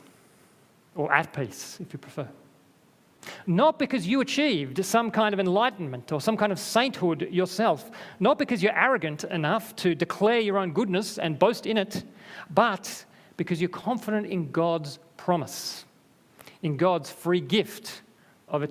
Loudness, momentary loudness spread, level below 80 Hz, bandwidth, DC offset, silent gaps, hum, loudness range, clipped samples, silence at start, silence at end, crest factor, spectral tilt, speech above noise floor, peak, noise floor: -26 LUFS; 15 LU; -70 dBFS; 16 kHz; under 0.1%; none; none; 5 LU; under 0.1%; 0.95 s; 0 s; 22 dB; -5 dB/octave; 34 dB; -4 dBFS; -60 dBFS